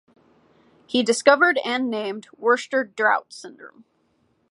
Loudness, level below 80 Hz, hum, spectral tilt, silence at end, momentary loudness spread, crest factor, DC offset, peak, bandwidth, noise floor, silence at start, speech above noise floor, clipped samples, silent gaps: -21 LUFS; -76 dBFS; none; -2.5 dB/octave; 0.85 s; 17 LU; 22 dB; under 0.1%; -2 dBFS; 11.5 kHz; -66 dBFS; 0.9 s; 45 dB; under 0.1%; none